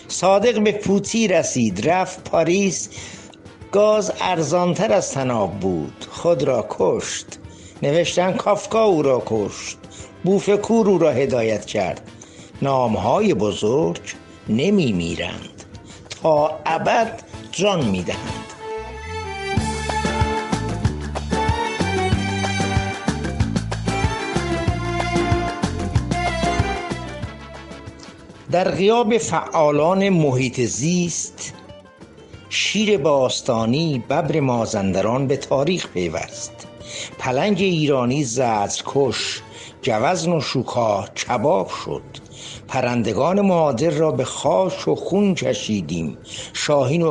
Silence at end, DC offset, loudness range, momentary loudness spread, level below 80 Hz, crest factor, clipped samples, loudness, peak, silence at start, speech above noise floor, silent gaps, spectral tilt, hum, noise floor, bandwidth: 0 s; under 0.1%; 3 LU; 14 LU; -38 dBFS; 16 dB; under 0.1%; -20 LUFS; -4 dBFS; 0 s; 24 dB; none; -5 dB/octave; none; -43 dBFS; 11.5 kHz